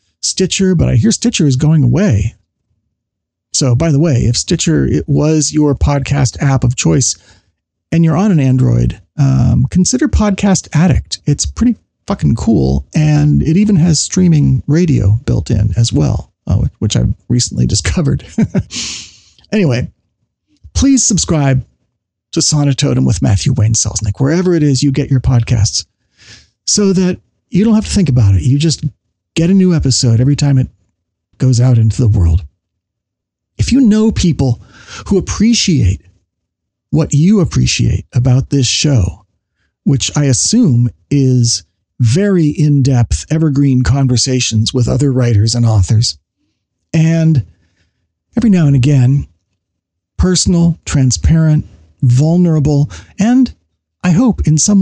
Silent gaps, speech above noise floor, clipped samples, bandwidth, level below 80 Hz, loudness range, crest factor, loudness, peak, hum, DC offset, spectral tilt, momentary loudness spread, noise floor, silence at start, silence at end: none; 67 dB; under 0.1%; 10 kHz; -28 dBFS; 3 LU; 8 dB; -12 LUFS; -2 dBFS; none; under 0.1%; -5.5 dB/octave; 7 LU; -77 dBFS; 0.25 s; 0 s